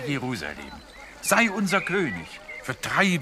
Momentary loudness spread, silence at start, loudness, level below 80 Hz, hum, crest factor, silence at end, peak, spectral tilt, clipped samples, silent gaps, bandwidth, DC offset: 19 LU; 0 s; -25 LUFS; -54 dBFS; none; 22 dB; 0 s; -4 dBFS; -4 dB/octave; under 0.1%; none; 15.5 kHz; under 0.1%